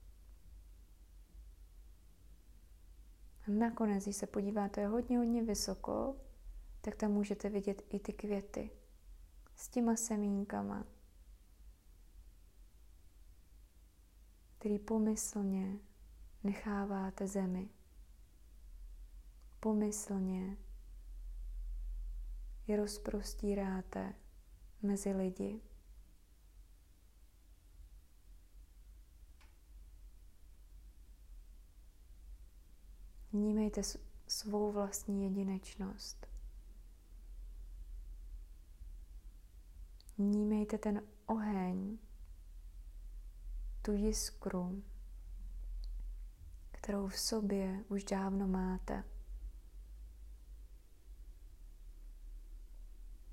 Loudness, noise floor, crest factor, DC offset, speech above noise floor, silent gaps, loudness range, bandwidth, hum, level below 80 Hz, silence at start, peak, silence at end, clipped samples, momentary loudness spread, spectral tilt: -39 LUFS; -63 dBFS; 18 dB; under 0.1%; 26 dB; none; 14 LU; 16 kHz; none; -52 dBFS; 0 s; -22 dBFS; 0 s; under 0.1%; 25 LU; -5.5 dB/octave